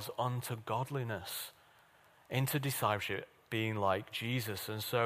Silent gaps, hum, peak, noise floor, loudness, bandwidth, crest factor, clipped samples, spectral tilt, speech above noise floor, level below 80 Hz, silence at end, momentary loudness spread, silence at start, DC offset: none; none; -18 dBFS; -65 dBFS; -37 LUFS; 15.5 kHz; 20 dB; under 0.1%; -4.5 dB/octave; 29 dB; -72 dBFS; 0 s; 7 LU; 0 s; under 0.1%